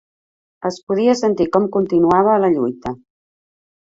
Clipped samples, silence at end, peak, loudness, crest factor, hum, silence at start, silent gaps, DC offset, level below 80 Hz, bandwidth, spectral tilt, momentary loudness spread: under 0.1%; 0.9 s; -2 dBFS; -17 LUFS; 16 dB; none; 0.6 s; 0.83-0.87 s; under 0.1%; -54 dBFS; 7.8 kHz; -6.5 dB/octave; 14 LU